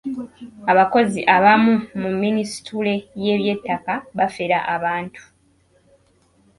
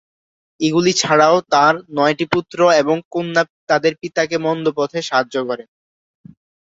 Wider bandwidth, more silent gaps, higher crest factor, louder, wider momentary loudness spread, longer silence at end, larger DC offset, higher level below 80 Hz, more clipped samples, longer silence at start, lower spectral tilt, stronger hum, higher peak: first, 11.5 kHz vs 8 kHz; second, none vs 3.05-3.11 s, 3.50-3.67 s; about the same, 20 dB vs 16 dB; about the same, -19 LUFS vs -17 LUFS; first, 13 LU vs 8 LU; first, 1.4 s vs 1.05 s; neither; about the same, -60 dBFS vs -60 dBFS; neither; second, 0.05 s vs 0.6 s; first, -5.5 dB/octave vs -4 dB/octave; neither; about the same, 0 dBFS vs -2 dBFS